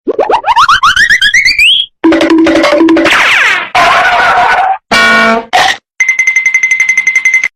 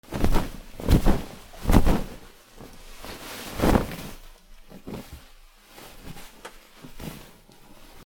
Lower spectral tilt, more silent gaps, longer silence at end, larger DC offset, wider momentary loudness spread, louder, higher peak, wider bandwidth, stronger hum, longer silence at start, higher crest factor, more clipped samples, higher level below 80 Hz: second, -2 dB/octave vs -6 dB/octave; neither; second, 0.1 s vs 0.85 s; neither; second, 5 LU vs 25 LU; first, -6 LUFS vs -26 LUFS; about the same, 0 dBFS vs -2 dBFS; second, 15.5 kHz vs 18.5 kHz; neither; about the same, 0.05 s vs 0.1 s; second, 8 dB vs 24 dB; neither; second, -38 dBFS vs -30 dBFS